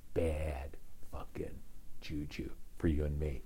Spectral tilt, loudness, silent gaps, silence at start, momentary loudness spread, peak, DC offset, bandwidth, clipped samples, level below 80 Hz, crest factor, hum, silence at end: -7.5 dB/octave; -40 LUFS; none; 0 s; 16 LU; -22 dBFS; under 0.1%; 16 kHz; under 0.1%; -44 dBFS; 16 dB; none; 0 s